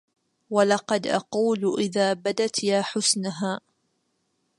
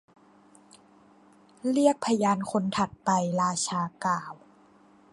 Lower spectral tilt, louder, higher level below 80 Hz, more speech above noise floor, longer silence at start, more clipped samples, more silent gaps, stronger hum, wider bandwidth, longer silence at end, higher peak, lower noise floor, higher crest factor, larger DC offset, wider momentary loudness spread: second, -3.5 dB/octave vs -5 dB/octave; first, -24 LUFS vs -27 LUFS; about the same, -72 dBFS vs -68 dBFS; first, 49 dB vs 31 dB; second, 0.5 s vs 1.65 s; neither; neither; neither; about the same, 11.5 kHz vs 11.5 kHz; first, 1 s vs 0.8 s; about the same, -6 dBFS vs -8 dBFS; first, -73 dBFS vs -58 dBFS; about the same, 20 dB vs 20 dB; neither; about the same, 6 LU vs 6 LU